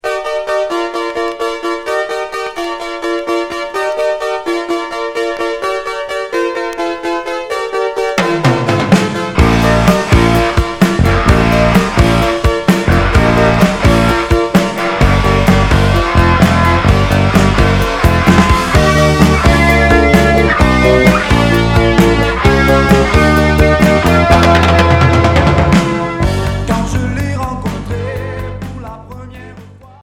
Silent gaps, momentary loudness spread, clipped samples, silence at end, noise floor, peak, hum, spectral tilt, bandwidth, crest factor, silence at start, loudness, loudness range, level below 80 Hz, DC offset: none; 10 LU; 0.3%; 0.35 s; -35 dBFS; 0 dBFS; none; -6 dB/octave; 17 kHz; 12 dB; 0.05 s; -12 LUFS; 8 LU; -20 dBFS; under 0.1%